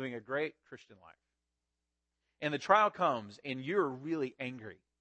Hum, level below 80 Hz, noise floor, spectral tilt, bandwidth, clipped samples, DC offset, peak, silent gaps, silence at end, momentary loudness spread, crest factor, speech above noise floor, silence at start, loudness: none; -82 dBFS; -87 dBFS; -5.5 dB/octave; 8.4 kHz; under 0.1%; under 0.1%; -12 dBFS; none; 0.25 s; 20 LU; 24 dB; 53 dB; 0 s; -34 LUFS